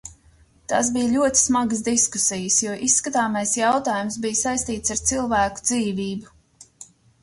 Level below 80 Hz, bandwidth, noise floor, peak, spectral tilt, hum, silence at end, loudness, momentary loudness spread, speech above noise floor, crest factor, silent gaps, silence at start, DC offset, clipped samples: -48 dBFS; 11.5 kHz; -55 dBFS; -4 dBFS; -2.5 dB/octave; none; 0.4 s; -21 LUFS; 7 LU; 33 dB; 18 dB; none; 0.05 s; under 0.1%; under 0.1%